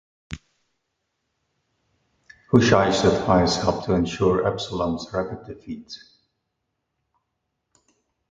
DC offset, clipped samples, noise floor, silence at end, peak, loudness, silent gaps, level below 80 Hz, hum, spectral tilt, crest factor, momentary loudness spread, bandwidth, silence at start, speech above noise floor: under 0.1%; under 0.1%; -78 dBFS; 2.35 s; -2 dBFS; -21 LUFS; none; -46 dBFS; none; -5.5 dB/octave; 22 dB; 22 LU; 9.4 kHz; 0.3 s; 57 dB